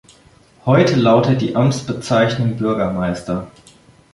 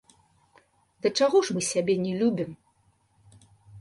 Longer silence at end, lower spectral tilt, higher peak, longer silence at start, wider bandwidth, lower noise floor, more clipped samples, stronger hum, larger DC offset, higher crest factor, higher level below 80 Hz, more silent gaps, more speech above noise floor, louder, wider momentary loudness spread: first, 0.65 s vs 0 s; first, -6.5 dB/octave vs -4.5 dB/octave; first, -2 dBFS vs -10 dBFS; second, 0.65 s vs 1.05 s; about the same, 11.5 kHz vs 11.5 kHz; second, -49 dBFS vs -66 dBFS; neither; neither; neither; about the same, 16 dB vs 18 dB; first, -46 dBFS vs -68 dBFS; neither; second, 33 dB vs 42 dB; first, -17 LUFS vs -25 LUFS; first, 12 LU vs 9 LU